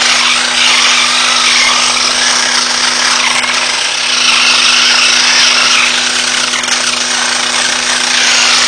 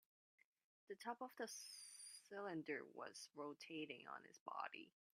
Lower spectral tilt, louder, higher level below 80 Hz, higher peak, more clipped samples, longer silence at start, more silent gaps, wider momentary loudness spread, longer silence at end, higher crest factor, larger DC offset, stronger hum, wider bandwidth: second, 2 dB/octave vs -3 dB/octave; first, -7 LUFS vs -53 LUFS; first, -48 dBFS vs under -90 dBFS; first, 0 dBFS vs -34 dBFS; first, 0.4% vs under 0.1%; second, 0 s vs 0.9 s; second, none vs 4.40-4.46 s; about the same, 5 LU vs 6 LU; second, 0 s vs 0.3 s; second, 10 dB vs 20 dB; neither; neither; second, 11 kHz vs 15.5 kHz